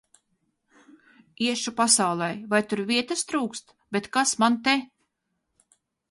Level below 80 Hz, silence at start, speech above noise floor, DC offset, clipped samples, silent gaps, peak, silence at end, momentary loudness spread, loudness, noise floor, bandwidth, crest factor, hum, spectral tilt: -70 dBFS; 1.4 s; 53 dB; under 0.1%; under 0.1%; none; -6 dBFS; 1.25 s; 10 LU; -24 LUFS; -78 dBFS; 11.5 kHz; 22 dB; none; -2.5 dB/octave